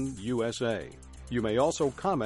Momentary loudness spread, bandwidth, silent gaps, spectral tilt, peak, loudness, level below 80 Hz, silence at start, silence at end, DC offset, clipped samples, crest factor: 12 LU; 11.5 kHz; none; -5.5 dB/octave; -14 dBFS; -30 LUFS; -52 dBFS; 0 s; 0 s; under 0.1%; under 0.1%; 16 dB